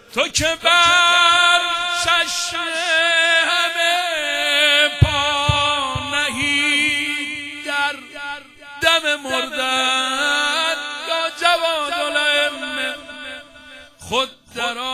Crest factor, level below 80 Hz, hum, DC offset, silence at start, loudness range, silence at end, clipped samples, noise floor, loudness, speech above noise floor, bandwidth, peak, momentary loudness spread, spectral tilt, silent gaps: 18 dB; -40 dBFS; none; under 0.1%; 0.1 s; 6 LU; 0 s; under 0.1%; -42 dBFS; -17 LUFS; 24 dB; 16 kHz; 0 dBFS; 12 LU; -2 dB/octave; none